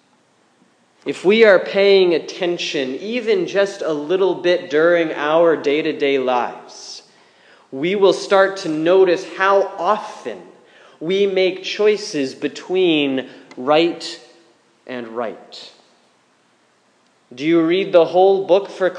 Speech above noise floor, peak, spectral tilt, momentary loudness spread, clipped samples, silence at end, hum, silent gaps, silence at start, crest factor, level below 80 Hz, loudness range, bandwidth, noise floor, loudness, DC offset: 41 dB; 0 dBFS; -4.5 dB/octave; 17 LU; under 0.1%; 0 s; none; none; 1.05 s; 18 dB; -80 dBFS; 7 LU; 9.8 kHz; -58 dBFS; -17 LUFS; under 0.1%